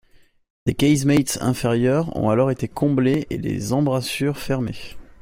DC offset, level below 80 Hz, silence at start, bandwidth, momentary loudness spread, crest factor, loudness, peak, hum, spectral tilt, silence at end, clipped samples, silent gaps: under 0.1%; -46 dBFS; 0.65 s; 16 kHz; 8 LU; 16 dB; -21 LUFS; -4 dBFS; none; -6 dB/octave; 0.2 s; under 0.1%; none